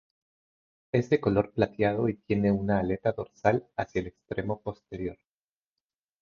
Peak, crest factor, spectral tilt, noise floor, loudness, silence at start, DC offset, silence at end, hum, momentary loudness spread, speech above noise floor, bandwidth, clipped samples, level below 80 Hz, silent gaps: -8 dBFS; 20 dB; -8.5 dB/octave; under -90 dBFS; -29 LUFS; 0.95 s; under 0.1%; 1.05 s; none; 11 LU; over 62 dB; 7 kHz; under 0.1%; -52 dBFS; none